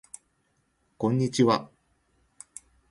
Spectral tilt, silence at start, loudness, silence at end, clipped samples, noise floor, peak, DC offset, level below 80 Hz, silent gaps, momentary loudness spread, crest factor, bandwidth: -6 dB/octave; 1 s; -25 LUFS; 1.25 s; under 0.1%; -72 dBFS; -10 dBFS; under 0.1%; -66 dBFS; none; 24 LU; 20 dB; 11.5 kHz